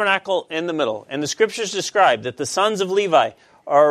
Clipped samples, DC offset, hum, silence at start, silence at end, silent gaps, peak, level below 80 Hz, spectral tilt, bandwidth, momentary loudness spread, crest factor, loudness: under 0.1%; under 0.1%; none; 0 s; 0 s; none; -2 dBFS; -70 dBFS; -3 dB/octave; 14 kHz; 8 LU; 18 dB; -20 LUFS